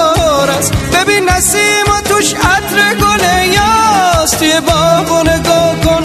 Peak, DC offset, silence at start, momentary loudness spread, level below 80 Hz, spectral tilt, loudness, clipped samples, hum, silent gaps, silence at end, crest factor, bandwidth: 0 dBFS; under 0.1%; 0 s; 2 LU; -26 dBFS; -3 dB/octave; -9 LUFS; under 0.1%; none; none; 0 s; 10 dB; 13.5 kHz